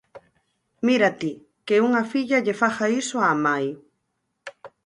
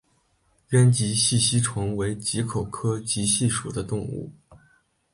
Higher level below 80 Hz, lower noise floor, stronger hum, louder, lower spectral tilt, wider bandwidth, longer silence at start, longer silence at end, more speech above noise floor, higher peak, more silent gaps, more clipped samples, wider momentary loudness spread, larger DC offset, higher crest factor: second, -72 dBFS vs -50 dBFS; first, -76 dBFS vs -66 dBFS; neither; about the same, -22 LUFS vs -23 LUFS; about the same, -4.5 dB/octave vs -4.5 dB/octave; about the same, 11 kHz vs 11.5 kHz; second, 0.15 s vs 0.7 s; second, 0.2 s vs 0.55 s; first, 54 dB vs 43 dB; about the same, -6 dBFS vs -8 dBFS; neither; neither; first, 22 LU vs 11 LU; neither; about the same, 18 dB vs 18 dB